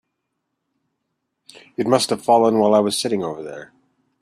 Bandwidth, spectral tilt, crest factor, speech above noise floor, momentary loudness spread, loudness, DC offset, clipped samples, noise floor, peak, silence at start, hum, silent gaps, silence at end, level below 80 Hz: 14 kHz; -4.5 dB/octave; 20 dB; 58 dB; 18 LU; -18 LUFS; under 0.1%; under 0.1%; -76 dBFS; -2 dBFS; 1.8 s; none; none; 0.55 s; -64 dBFS